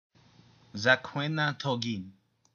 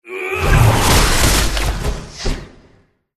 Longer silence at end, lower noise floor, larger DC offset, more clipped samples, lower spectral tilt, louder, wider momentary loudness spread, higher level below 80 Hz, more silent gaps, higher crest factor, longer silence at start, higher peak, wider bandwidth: second, 0.45 s vs 0.7 s; first, -60 dBFS vs -53 dBFS; neither; neither; about the same, -5 dB/octave vs -4 dB/octave; second, -29 LUFS vs -15 LUFS; first, 16 LU vs 13 LU; second, -76 dBFS vs -20 dBFS; neither; first, 24 dB vs 16 dB; first, 0.75 s vs 0.05 s; second, -8 dBFS vs 0 dBFS; second, 7.2 kHz vs 13.5 kHz